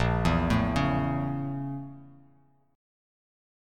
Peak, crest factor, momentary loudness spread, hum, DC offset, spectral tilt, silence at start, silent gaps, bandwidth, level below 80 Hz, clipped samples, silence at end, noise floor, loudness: -12 dBFS; 18 dB; 12 LU; none; under 0.1%; -7 dB/octave; 0 s; none; 13 kHz; -40 dBFS; under 0.1%; 1.6 s; -63 dBFS; -28 LUFS